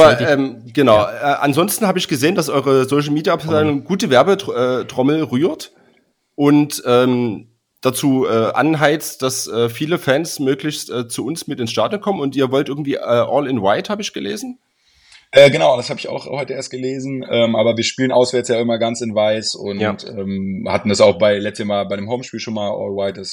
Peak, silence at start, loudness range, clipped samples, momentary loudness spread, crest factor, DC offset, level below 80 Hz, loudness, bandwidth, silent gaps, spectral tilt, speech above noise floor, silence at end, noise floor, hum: 0 dBFS; 0 s; 3 LU; 0.1%; 11 LU; 16 dB; under 0.1%; -58 dBFS; -17 LUFS; over 20 kHz; none; -5 dB/octave; 42 dB; 0 s; -58 dBFS; none